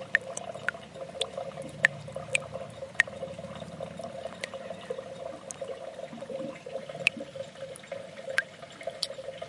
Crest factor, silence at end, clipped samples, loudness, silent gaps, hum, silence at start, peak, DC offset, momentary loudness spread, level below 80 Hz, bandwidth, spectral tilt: 32 dB; 0 s; under 0.1%; -34 LUFS; none; none; 0 s; -4 dBFS; under 0.1%; 13 LU; -72 dBFS; 11.5 kHz; -2.5 dB/octave